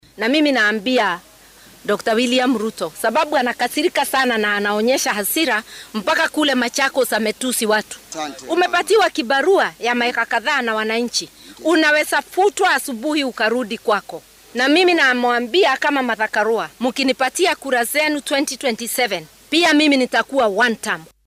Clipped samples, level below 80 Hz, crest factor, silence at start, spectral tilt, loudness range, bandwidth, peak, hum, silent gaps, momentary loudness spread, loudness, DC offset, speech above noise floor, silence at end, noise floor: under 0.1%; -60 dBFS; 12 dB; 0.15 s; -2 dB/octave; 2 LU; 16 kHz; -6 dBFS; none; none; 8 LU; -17 LUFS; under 0.1%; 28 dB; 0.2 s; -46 dBFS